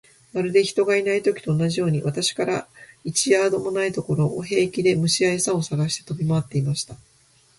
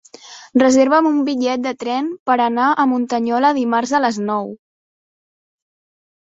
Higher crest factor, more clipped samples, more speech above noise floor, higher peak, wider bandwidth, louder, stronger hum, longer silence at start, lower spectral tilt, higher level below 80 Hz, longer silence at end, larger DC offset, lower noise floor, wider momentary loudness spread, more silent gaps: about the same, 18 dB vs 18 dB; neither; first, 36 dB vs 24 dB; second, -6 dBFS vs 0 dBFS; first, 11.5 kHz vs 8 kHz; second, -22 LUFS vs -17 LUFS; neither; about the same, 0.35 s vs 0.25 s; about the same, -4.5 dB/octave vs -4 dB/octave; first, -58 dBFS vs -64 dBFS; second, 0.6 s vs 1.8 s; neither; first, -58 dBFS vs -40 dBFS; about the same, 7 LU vs 9 LU; second, none vs 2.20-2.26 s